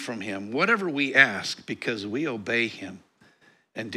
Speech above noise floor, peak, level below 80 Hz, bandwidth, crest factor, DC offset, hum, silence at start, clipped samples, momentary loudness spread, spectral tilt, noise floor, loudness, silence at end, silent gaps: 34 dB; 0 dBFS; -76 dBFS; 14.5 kHz; 26 dB; under 0.1%; none; 0 s; under 0.1%; 19 LU; -4 dB/octave; -60 dBFS; -24 LUFS; 0 s; none